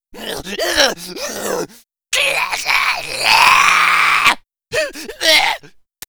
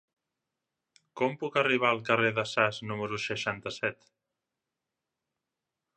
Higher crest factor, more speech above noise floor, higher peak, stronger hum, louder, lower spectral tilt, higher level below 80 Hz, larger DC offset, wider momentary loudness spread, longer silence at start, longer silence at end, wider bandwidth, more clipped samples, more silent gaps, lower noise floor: second, 16 dB vs 24 dB; second, 24 dB vs 58 dB; first, 0 dBFS vs -8 dBFS; neither; first, -14 LUFS vs -29 LUFS; second, -0.5 dB/octave vs -4.5 dB/octave; first, -46 dBFS vs -70 dBFS; neither; first, 15 LU vs 9 LU; second, 0.15 s vs 1.15 s; second, 0.4 s vs 2.05 s; first, over 20 kHz vs 11 kHz; neither; neither; second, -41 dBFS vs -88 dBFS